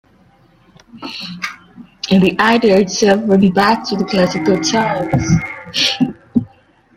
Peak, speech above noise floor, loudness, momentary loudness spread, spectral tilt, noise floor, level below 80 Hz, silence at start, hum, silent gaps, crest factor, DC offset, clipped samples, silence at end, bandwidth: 0 dBFS; 37 dB; -14 LUFS; 15 LU; -5 dB/octave; -50 dBFS; -44 dBFS; 0.95 s; none; none; 14 dB; under 0.1%; under 0.1%; 0.5 s; 14.5 kHz